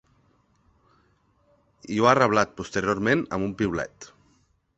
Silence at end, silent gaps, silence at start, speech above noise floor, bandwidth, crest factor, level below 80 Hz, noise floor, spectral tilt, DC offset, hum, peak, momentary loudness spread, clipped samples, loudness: 0.7 s; none; 1.9 s; 41 dB; 8.4 kHz; 24 dB; -54 dBFS; -65 dBFS; -5.5 dB/octave; under 0.1%; none; -2 dBFS; 12 LU; under 0.1%; -24 LUFS